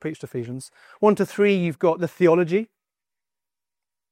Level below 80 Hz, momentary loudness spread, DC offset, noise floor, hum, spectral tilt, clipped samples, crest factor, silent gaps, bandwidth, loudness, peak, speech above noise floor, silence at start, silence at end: -70 dBFS; 14 LU; under 0.1%; under -90 dBFS; none; -7 dB/octave; under 0.1%; 18 dB; none; 15.5 kHz; -21 LUFS; -6 dBFS; over 69 dB; 0.05 s; 1.45 s